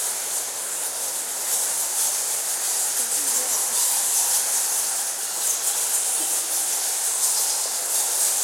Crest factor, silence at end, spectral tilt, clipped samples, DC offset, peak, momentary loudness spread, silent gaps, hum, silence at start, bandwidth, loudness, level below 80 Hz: 16 dB; 0 s; 3 dB/octave; under 0.1%; under 0.1%; -6 dBFS; 6 LU; none; none; 0 s; 16.5 kHz; -21 LUFS; -80 dBFS